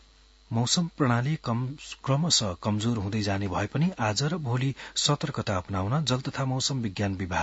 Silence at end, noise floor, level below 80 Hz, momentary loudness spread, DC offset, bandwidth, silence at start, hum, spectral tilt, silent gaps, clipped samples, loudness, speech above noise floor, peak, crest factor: 0 s; -57 dBFS; -56 dBFS; 6 LU; under 0.1%; 8.2 kHz; 0.5 s; none; -4.5 dB/octave; none; under 0.1%; -27 LUFS; 29 dB; -8 dBFS; 20 dB